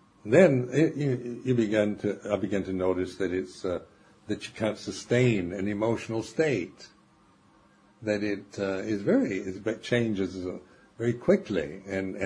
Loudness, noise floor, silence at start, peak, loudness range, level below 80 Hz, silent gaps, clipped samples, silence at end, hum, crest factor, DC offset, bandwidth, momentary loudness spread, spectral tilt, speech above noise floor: -28 LUFS; -61 dBFS; 0.25 s; -6 dBFS; 4 LU; -62 dBFS; none; under 0.1%; 0 s; none; 22 dB; under 0.1%; 10.5 kHz; 10 LU; -6.5 dB/octave; 33 dB